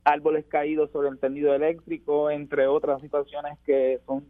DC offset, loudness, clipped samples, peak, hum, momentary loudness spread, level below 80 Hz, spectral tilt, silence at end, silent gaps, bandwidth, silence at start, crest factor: under 0.1%; -25 LUFS; under 0.1%; -6 dBFS; none; 6 LU; -60 dBFS; -8 dB/octave; 0.05 s; none; 4.8 kHz; 0.05 s; 18 dB